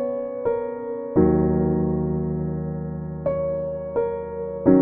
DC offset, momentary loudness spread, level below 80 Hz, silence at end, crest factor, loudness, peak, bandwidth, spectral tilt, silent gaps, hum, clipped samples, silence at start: under 0.1%; 10 LU; -42 dBFS; 0 s; 20 dB; -24 LUFS; -2 dBFS; 2.5 kHz; -14.5 dB/octave; none; none; under 0.1%; 0 s